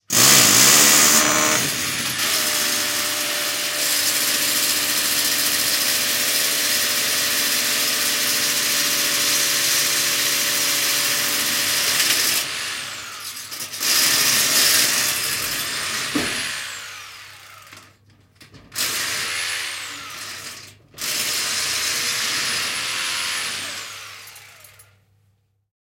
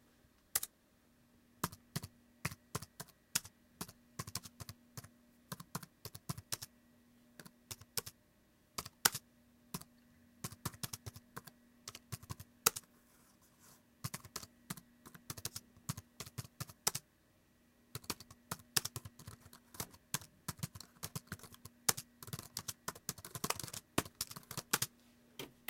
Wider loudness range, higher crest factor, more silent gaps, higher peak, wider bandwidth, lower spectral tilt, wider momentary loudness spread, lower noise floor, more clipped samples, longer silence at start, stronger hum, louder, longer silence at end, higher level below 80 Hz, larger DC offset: about the same, 9 LU vs 7 LU; second, 20 dB vs 40 dB; neither; first, -2 dBFS vs -6 dBFS; about the same, 17 kHz vs 17 kHz; second, 0.5 dB/octave vs -2 dB/octave; about the same, 16 LU vs 18 LU; second, -64 dBFS vs -71 dBFS; neither; second, 0.1 s vs 0.55 s; neither; first, -17 LUFS vs -43 LUFS; first, 1.5 s vs 0.15 s; first, -60 dBFS vs -70 dBFS; neither